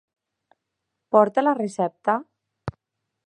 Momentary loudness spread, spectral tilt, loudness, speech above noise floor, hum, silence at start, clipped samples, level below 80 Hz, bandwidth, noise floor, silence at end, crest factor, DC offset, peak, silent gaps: 19 LU; -7 dB/octave; -22 LUFS; 61 dB; none; 1.1 s; under 0.1%; -58 dBFS; 10.5 kHz; -81 dBFS; 0.55 s; 22 dB; under 0.1%; -2 dBFS; none